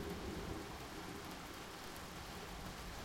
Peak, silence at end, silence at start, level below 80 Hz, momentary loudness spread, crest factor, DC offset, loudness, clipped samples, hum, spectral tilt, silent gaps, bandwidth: -32 dBFS; 0 s; 0 s; -56 dBFS; 3 LU; 16 dB; under 0.1%; -48 LUFS; under 0.1%; none; -4 dB/octave; none; 16.5 kHz